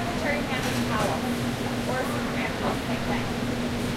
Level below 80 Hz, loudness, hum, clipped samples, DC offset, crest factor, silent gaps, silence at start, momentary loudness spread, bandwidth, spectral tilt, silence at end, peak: -42 dBFS; -27 LUFS; none; under 0.1%; under 0.1%; 14 dB; none; 0 s; 3 LU; 16 kHz; -5 dB/octave; 0 s; -12 dBFS